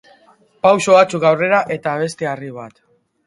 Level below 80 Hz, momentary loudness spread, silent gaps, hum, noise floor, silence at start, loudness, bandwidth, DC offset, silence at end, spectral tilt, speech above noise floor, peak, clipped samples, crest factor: -62 dBFS; 16 LU; none; none; -52 dBFS; 0.65 s; -15 LUFS; 11.5 kHz; under 0.1%; 0.6 s; -5 dB/octave; 37 dB; 0 dBFS; under 0.1%; 16 dB